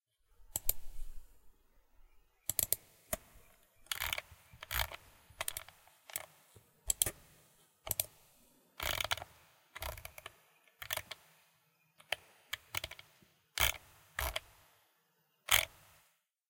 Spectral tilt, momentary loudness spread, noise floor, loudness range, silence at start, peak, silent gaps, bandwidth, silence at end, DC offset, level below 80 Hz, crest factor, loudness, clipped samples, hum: -0.5 dB/octave; 22 LU; -77 dBFS; 8 LU; 0.4 s; -8 dBFS; none; 17 kHz; 0.8 s; under 0.1%; -54 dBFS; 36 dB; -37 LUFS; under 0.1%; none